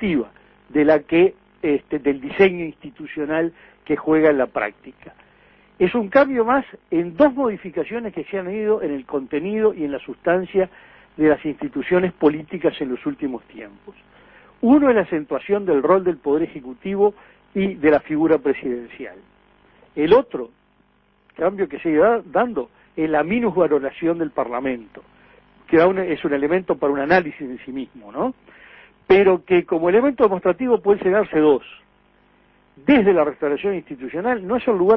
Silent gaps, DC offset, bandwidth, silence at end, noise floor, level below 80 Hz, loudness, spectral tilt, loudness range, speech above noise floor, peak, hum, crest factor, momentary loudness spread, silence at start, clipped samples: none; under 0.1%; 5.8 kHz; 0 s; -60 dBFS; -54 dBFS; -20 LUFS; -9.5 dB/octave; 4 LU; 41 dB; -2 dBFS; none; 18 dB; 13 LU; 0 s; under 0.1%